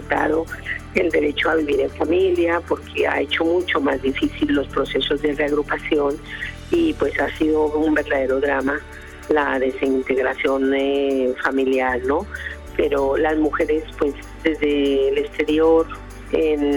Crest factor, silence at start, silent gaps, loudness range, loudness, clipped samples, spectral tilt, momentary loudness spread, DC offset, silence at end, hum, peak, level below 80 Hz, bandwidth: 14 dB; 0 s; none; 1 LU; -20 LUFS; under 0.1%; -5.5 dB/octave; 6 LU; under 0.1%; 0 s; none; -4 dBFS; -40 dBFS; 18 kHz